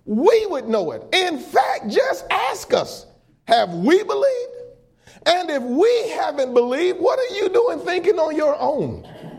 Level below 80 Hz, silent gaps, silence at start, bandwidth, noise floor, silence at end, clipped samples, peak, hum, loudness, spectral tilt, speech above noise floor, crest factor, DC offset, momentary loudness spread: -58 dBFS; none; 0.05 s; 15.5 kHz; -50 dBFS; 0 s; under 0.1%; -2 dBFS; none; -19 LUFS; -4.5 dB/octave; 31 dB; 18 dB; under 0.1%; 6 LU